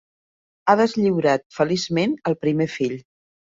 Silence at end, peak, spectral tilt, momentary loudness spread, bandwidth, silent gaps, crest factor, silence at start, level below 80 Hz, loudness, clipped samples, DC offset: 0.6 s; -2 dBFS; -6 dB/octave; 8 LU; 7.8 kHz; 1.46-1.50 s; 20 dB; 0.65 s; -62 dBFS; -21 LUFS; under 0.1%; under 0.1%